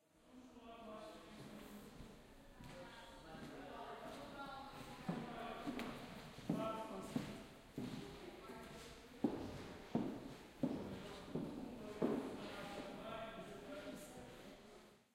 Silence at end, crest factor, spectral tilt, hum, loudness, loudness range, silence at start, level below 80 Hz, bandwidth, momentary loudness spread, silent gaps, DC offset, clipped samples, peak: 0.1 s; 24 dB; -6 dB/octave; none; -49 LUFS; 9 LU; 0.15 s; -68 dBFS; 16 kHz; 14 LU; none; under 0.1%; under 0.1%; -24 dBFS